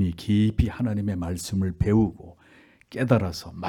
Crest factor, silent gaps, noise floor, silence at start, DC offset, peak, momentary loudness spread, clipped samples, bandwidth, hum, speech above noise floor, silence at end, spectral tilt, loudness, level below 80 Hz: 18 dB; none; -55 dBFS; 0 s; under 0.1%; -6 dBFS; 8 LU; under 0.1%; 17 kHz; none; 31 dB; 0 s; -7 dB/octave; -25 LUFS; -40 dBFS